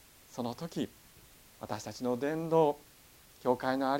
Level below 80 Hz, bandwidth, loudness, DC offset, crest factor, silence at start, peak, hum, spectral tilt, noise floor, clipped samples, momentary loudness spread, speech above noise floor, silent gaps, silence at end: -68 dBFS; 17 kHz; -34 LUFS; under 0.1%; 20 dB; 0.3 s; -14 dBFS; none; -6 dB/octave; -59 dBFS; under 0.1%; 14 LU; 27 dB; none; 0 s